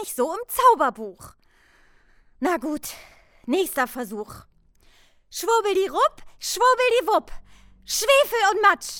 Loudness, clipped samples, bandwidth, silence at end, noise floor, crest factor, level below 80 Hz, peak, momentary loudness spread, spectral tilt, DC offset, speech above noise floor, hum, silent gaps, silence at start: -22 LUFS; under 0.1%; over 20 kHz; 0 s; -57 dBFS; 20 dB; -52 dBFS; -4 dBFS; 18 LU; -1.5 dB/octave; under 0.1%; 35 dB; none; none; 0 s